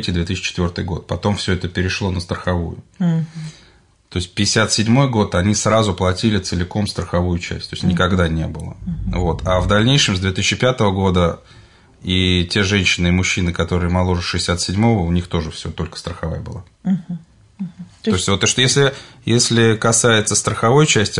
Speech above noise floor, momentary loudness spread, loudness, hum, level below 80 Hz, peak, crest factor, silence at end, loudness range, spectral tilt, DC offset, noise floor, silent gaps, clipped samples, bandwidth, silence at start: 32 dB; 13 LU; -17 LUFS; none; -38 dBFS; -2 dBFS; 16 dB; 0 s; 6 LU; -4.5 dB/octave; under 0.1%; -50 dBFS; none; under 0.1%; 11 kHz; 0 s